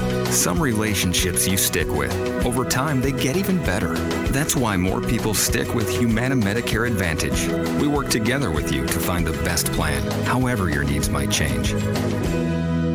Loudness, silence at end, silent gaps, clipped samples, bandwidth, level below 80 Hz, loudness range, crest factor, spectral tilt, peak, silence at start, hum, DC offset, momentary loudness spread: -21 LUFS; 0 s; none; under 0.1%; over 20 kHz; -34 dBFS; 1 LU; 14 dB; -4.5 dB/octave; -6 dBFS; 0 s; none; under 0.1%; 4 LU